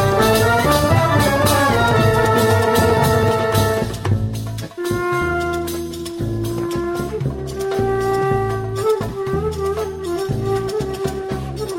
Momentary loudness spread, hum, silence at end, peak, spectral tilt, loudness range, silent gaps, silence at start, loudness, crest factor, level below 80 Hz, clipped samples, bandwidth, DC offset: 10 LU; none; 0 s; -2 dBFS; -5.5 dB/octave; 7 LU; none; 0 s; -18 LUFS; 16 dB; -34 dBFS; under 0.1%; 16.5 kHz; under 0.1%